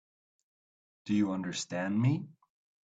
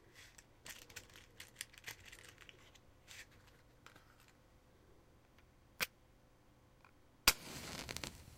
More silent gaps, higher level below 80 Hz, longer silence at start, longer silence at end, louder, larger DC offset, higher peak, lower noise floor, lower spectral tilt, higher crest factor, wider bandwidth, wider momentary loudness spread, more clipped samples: neither; second, -74 dBFS vs -62 dBFS; first, 1.05 s vs 0 s; first, 0.55 s vs 0 s; first, -32 LUFS vs -41 LUFS; neither; second, -16 dBFS vs -10 dBFS; first, under -90 dBFS vs -68 dBFS; first, -6 dB/octave vs -0.5 dB/octave; second, 18 dB vs 38 dB; second, 9 kHz vs 16.5 kHz; second, 13 LU vs 30 LU; neither